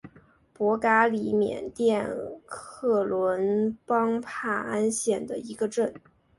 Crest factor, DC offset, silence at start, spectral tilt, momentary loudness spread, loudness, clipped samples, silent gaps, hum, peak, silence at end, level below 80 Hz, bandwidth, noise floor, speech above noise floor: 20 dB; under 0.1%; 0.05 s; -5 dB/octave; 10 LU; -26 LUFS; under 0.1%; none; none; -8 dBFS; 0.4 s; -64 dBFS; 11.5 kHz; -57 dBFS; 31 dB